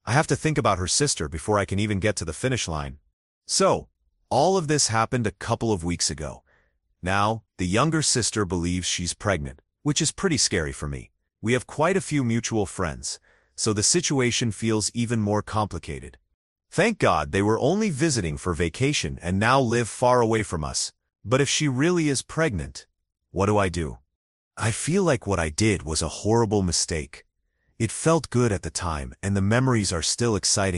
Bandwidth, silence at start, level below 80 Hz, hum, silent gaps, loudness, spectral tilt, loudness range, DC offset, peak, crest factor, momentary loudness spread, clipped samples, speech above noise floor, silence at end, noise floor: 12 kHz; 0.05 s; -44 dBFS; none; 3.13-3.41 s, 16.34-16.56 s, 24.15-24.51 s; -24 LUFS; -4 dB/octave; 3 LU; under 0.1%; -4 dBFS; 20 dB; 10 LU; under 0.1%; 47 dB; 0 s; -71 dBFS